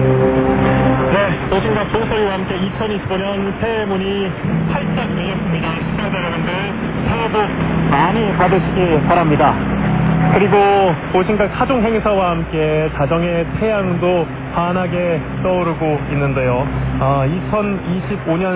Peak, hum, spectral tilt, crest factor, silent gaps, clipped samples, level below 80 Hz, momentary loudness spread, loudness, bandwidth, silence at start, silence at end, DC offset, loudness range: 0 dBFS; none; -11 dB/octave; 16 dB; none; under 0.1%; -32 dBFS; 6 LU; -16 LUFS; 4 kHz; 0 s; 0 s; under 0.1%; 5 LU